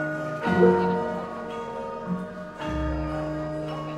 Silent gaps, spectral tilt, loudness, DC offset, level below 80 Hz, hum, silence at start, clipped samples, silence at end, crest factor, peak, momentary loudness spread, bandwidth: none; -8 dB/octave; -27 LUFS; under 0.1%; -42 dBFS; none; 0 s; under 0.1%; 0 s; 20 dB; -6 dBFS; 14 LU; 10.5 kHz